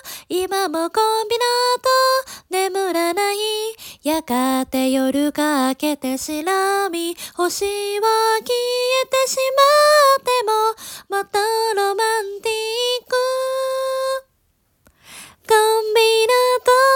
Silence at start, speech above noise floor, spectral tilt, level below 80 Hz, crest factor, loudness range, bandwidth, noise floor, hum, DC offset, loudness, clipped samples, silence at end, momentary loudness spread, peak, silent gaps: 0.05 s; 46 dB; -1 dB/octave; -60 dBFS; 16 dB; 5 LU; 18 kHz; -64 dBFS; none; under 0.1%; -18 LUFS; under 0.1%; 0 s; 9 LU; -2 dBFS; none